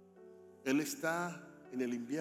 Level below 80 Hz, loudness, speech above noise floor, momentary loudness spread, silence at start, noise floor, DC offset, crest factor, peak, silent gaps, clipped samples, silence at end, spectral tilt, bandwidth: -90 dBFS; -38 LUFS; 21 dB; 23 LU; 0 s; -58 dBFS; under 0.1%; 18 dB; -22 dBFS; none; under 0.1%; 0 s; -4.5 dB/octave; 16.5 kHz